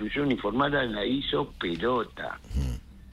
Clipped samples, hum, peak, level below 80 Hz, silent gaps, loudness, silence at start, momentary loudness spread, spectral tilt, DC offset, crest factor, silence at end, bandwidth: under 0.1%; none; -12 dBFS; -40 dBFS; none; -29 LUFS; 0 s; 9 LU; -6.5 dB/octave; under 0.1%; 18 dB; 0 s; 13 kHz